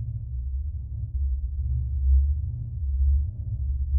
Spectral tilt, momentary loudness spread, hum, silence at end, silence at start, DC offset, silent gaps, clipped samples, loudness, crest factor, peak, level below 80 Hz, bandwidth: -14.5 dB/octave; 10 LU; none; 0 s; 0 s; under 0.1%; none; under 0.1%; -28 LUFS; 12 dB; -12 dBFS; -26 dBFS; 0.6 kHz